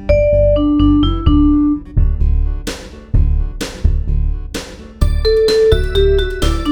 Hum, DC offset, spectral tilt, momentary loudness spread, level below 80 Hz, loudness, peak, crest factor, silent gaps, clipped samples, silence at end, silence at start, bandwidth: none; under 0.1%; -7 dB/octave; 13 LU; -16 dBFS; -15 LUFS; 0 dBFS; 14 dB; none; under 0.1%; 0 s; 0 s; 18 kHz